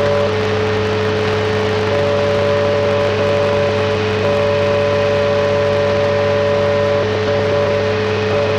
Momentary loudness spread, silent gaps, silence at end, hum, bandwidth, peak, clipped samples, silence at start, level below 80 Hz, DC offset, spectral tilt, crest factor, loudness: 2 LU; none; 0 s; none; 9.6 kHz; -6 dBFS; under 0.1%; 0 s; -42 dBFS; under 0.1%; -6 dB/octave; 10 dB; -15 LUFS